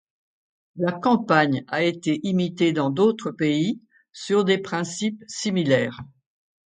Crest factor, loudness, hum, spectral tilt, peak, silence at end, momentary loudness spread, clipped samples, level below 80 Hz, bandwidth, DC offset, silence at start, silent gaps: 22 dB; -23 LUFS; none; -5.5 dB/octave; -2 dBFS; 0.6 s; 9 LU; under 0.1%; -66 dBFS; 9.4 kHz; under 0.1%; 0.75 s; none